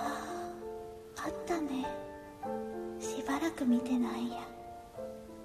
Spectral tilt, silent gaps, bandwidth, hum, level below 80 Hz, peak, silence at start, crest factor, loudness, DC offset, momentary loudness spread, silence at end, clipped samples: -4.5 dB/octave; none; 14 kHz; none; -62 dBFS; -20 dBFS; 0 s; 16 dB; -37 LUFS; under 0.1%; 15 LU; 0 s; under 0.1%